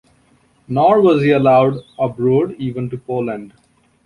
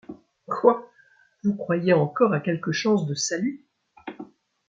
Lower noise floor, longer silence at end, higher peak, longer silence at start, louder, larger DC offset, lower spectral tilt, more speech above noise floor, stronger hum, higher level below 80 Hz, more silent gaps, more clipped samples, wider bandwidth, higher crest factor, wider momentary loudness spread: second, -55 dBFS vs -59 dBFS; first, 0.6 s vs 0.45 s; about the same, -2 dBFS vs -4 dBFS; first, 0.7 s vs 0.1 s; first, -16 LUFS vs -24 LUFS; neither; first, -9 dB/octave vs -5.5 dB/octave; about the same, 40 dB vs 37 dB; neither; first, -54 dBFS vs -70 dBFS; neither; neither; first, 10.5 kHz vs 9.2 kHz; second, 14 dB vs 22 dB; second, 12 LU vs 21 LU